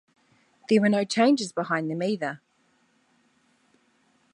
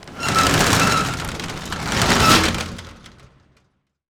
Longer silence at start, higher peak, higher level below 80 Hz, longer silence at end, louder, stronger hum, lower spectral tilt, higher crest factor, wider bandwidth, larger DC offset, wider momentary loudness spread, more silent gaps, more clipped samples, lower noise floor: first, 0.7 s vs 0 s; second, -8 dBFS vs 0 dBFS; second, -76 dBFS vs -36 dBFS; first, 1.95 s vs 1.15 s; second, -24 LUFS vs -17 LUFS; neither; first, -5 dB/octave vs -3 dB/octave; about the same, 18 dB vs 20 dB; second, 10.5 kHz vs over 20 kHz; neither; second, 12 LU vs 15 LU; neither; neither; about the same, -67 dBFS vs -66 dBFS